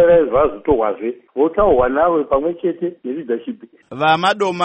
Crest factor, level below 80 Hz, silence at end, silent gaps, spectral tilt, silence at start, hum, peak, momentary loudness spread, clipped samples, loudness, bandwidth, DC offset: 14 dB; -40 dBFS; 0 s; none; -6 dB/octave; 0 s; none; -2 dBFS; 11 LU; under 0.1%; -17 LUFS; 8.4 kHz; under 0.1%